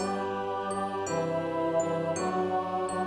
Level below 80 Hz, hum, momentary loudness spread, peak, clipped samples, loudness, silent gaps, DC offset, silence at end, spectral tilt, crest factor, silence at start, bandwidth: -68 dBFS; none; 3 LU; -18 dBFS; under 0.1%; -30 LUFS; none; under 0.1%; 0 s; -5.5 dB/octave; 12 dB; 0 s; 11.5 kHz